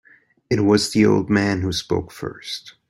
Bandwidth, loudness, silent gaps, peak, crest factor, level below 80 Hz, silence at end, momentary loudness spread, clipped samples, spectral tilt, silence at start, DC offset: 16 kHz; -19 LUFS; none; -4 dBFS; 18 dB; -50 dBFS; 0.2 s; 14 LU; under 0.1%; -5.5 dB/octave; 0.5 s; under 0.1%